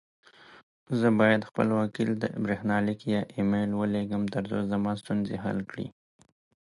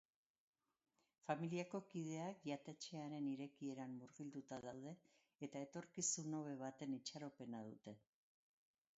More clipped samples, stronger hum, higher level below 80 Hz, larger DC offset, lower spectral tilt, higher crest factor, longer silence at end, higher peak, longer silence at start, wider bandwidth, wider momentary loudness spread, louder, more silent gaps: neither; neither; first, -60 dBFS vs under -90 dBFS; neither; first, -7.5 dB/octave vs -5.5 dB/octave; about the same, 20 dB vs 24 dB; second, 0.85 s vs 1 s; first, -8 dBFS vs -28 dBFS; second, 0.5 s vs 1.25 s; first, 11 kHz vs 7.6 kHz; second, 9 LU vs 12 LU; first, -28 LUFS vs -50 LUFS; first, 0.63-0.86 s vs 5.35-5.39 s